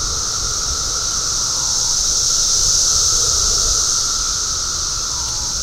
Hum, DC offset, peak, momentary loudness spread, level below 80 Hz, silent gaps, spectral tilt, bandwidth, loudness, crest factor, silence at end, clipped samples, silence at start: none; under 0.1%; -2 dBFS; 6 LU; -32 dBFS; none; 0.5 dB/octave; 16.5 kHz; -15 LUFS; 16 dB; 0 s; under 0.1%; 0 s